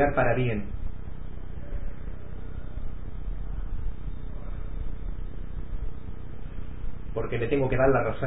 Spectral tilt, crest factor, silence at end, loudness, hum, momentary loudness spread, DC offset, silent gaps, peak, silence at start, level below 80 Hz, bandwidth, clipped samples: -11.5 dB/octave; 20 dB; 0 s; -32 LUFS; none; 18 LU; 3%; none; -10 dBFS; 0 s; -36 dBFS; 4 kHz; under 0.1%